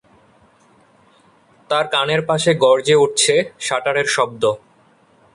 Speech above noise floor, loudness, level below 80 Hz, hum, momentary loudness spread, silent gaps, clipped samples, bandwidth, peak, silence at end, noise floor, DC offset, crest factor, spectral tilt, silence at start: 37 dB; -16 LUFS; -60 dBFS; none; 7 LU; none; under 0.1%; 11.5 kHz; -2 dBFS; 0.8 s; -54 dBFS; under 0.1%; 16 dB; -3 dB/octave; 1.7 s